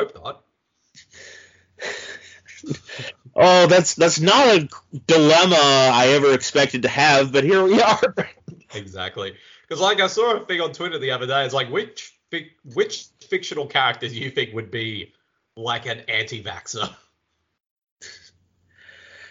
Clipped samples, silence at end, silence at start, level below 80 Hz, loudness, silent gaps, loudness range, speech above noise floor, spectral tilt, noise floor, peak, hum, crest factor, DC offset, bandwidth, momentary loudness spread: under 0.1%; 1.2 s; 0 s; -64 dBFS; -18 LUFS; 17.71-17.82 s, 17.91-17.97 s; 14 LU; 54 dB; -3.5 dB/octave; -73 dBFS; 0 dBFS; none; 20 dB; under 0.1%; 7.6 kHz; 20 LU